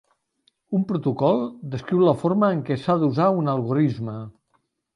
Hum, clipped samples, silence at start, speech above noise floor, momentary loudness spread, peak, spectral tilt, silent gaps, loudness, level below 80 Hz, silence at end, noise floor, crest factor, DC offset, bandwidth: none; under 0.1%; 0.7 s; 48 dB; 12 LU; -6 dBFS; -9.5 dB/octave; none; -22 LUFS; -62 dBFS; 0.65 s; -70 dBFS; 18 dB; under 0.1%; 10.5 kHz